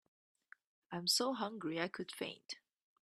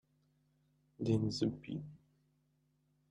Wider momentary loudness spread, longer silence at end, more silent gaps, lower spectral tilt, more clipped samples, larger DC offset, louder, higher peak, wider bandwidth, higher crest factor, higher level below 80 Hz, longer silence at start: first, 16 LU vs 12 LU; second, 0.5 s vs 1.15 s; neither; second, -2.5 dB/octave vs -7 dB/octave; neither; neither; about the same, -39 LUFS vs -38 LUFS; about the same, -20 dBFS vs -20 dBFS; first, 14 kHz vs 11 kHz; about the same, 22 dB vs 22 dB; second, -86 dBFS vs -70 dBFS; about the same, 0.9 s vs 1 s